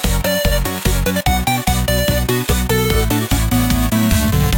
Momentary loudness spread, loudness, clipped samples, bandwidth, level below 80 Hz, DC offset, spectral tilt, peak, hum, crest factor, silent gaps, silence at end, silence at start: 2 LU; -16 LUFS; under 0.1%; 17.5 kHz; -20 dBFS; under 0.1%; -4.5 dB/octave; -2 dBFS; none; 12 dB; none; 0 s; 0 s